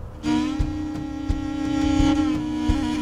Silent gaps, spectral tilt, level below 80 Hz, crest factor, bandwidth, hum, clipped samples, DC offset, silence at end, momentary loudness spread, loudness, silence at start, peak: none; -6.5 dB/octave; -30 dBFS; 16 dB; 11 kHz; none; under 0.1%; under 0.1%; 0 s; 9 LU; -24 LUFS; 0 s; -6 dBFS